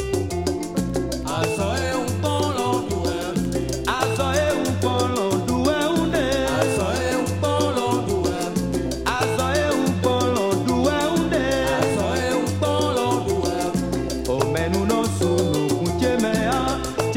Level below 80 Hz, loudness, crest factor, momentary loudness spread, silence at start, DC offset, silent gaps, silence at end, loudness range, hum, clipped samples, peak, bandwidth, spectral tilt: -40 dBFS; -22 LUFS; 16 dB; 4 LU; 0 s; under 0.1%; none; 0 s; 2 LU; none; under 0.1%; -6 dBFS; 17 kHz; -5 dB/octave